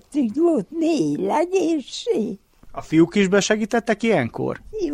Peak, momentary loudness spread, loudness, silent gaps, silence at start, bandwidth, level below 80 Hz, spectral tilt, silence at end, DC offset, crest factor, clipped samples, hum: -6 dBFS; 10 LU; -21 LUFS; none; 0.1 s; 11.5 kHz; -52 dBFS; -5.5 dB/octave; 0 s; under 0.1%; 16 dB; under 0.1%; none